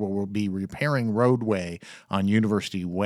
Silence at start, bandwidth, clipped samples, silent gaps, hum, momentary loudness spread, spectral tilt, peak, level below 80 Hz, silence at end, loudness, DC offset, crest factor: 0 s; 12.5 kHz; under 0.1%; none; none; 8 LU; -7 dB/octave; -8 dBFS; -60 dBFS; 0 s; -25 LUFS; under 0.1%; 18 dB